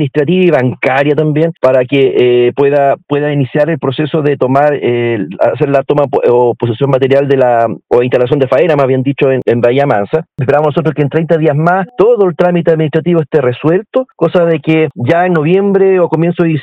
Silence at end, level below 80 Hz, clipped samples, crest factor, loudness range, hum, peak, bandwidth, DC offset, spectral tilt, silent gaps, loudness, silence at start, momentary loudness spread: 0 s; -52 dBFS; 0.7%; 10 dB; 1 LU; none; 0 dBFS; 7.4 kHz; under 0.1%; -9 dB/octave; none; -10 LUFS; 0 s; 4 LU